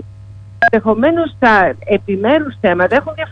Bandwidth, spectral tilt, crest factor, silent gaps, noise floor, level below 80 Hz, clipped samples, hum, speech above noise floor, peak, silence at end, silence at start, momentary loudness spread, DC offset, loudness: 8.6 kHz; -7.5 dB/octave; 14 dB; none; -34 dBFS; -44 dBFS; under 0.1%; none; 21 dB; 0 dBFS; 0 s; 0 s; 5 LU; under 0.1%; -13 LUFS